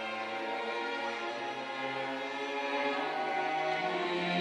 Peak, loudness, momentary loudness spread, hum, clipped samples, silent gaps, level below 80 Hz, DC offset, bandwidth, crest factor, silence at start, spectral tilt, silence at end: -20 dBFS; -34 LUFS; 4 LU; none; under 0.1%; none; -84 dBFS; under 0.1%; 11.5 kHz; 16 dB; 0 s; -4.5 dB/octave; 0 s